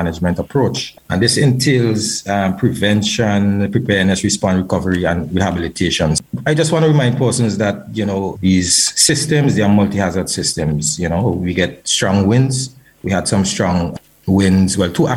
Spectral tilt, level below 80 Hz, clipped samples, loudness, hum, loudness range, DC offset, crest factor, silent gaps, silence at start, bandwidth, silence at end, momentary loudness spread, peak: -4.5 dB/octave; -40 dBFS; under 0.1%; -15 LUFS; none; 2 LU; under 0.1%; 16 dB; none; 0 s; 16 kHz; 0 s; 7 LU; 0 dBFS